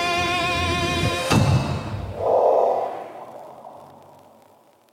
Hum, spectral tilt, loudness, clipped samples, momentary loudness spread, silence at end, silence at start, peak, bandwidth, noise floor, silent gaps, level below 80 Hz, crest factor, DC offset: none; -5 dB/octave; -21 LUFS; under 0.1%; 21 LU; 1.05 s; 0 s; -6 dBFS; 16.5 kHz; -54 dBFS; none; -44 dBFS; 18 dB; under 0.1%